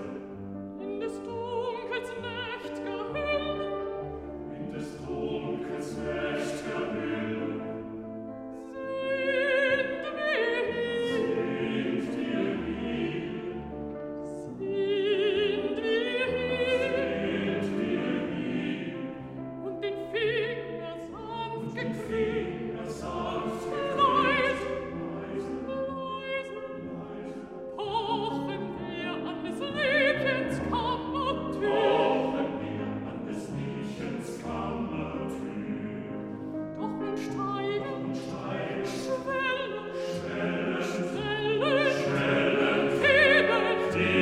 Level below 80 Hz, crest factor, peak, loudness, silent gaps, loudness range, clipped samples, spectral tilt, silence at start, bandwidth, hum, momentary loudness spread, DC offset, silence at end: -56 dBFS; 20 dB; -10 dBFS; -30 LUFS; none; 7 LU; under 0.1%; -5.5 dB/octave; 0 s; 13 kHz; none; 13 LU; under 0.1%; 0 s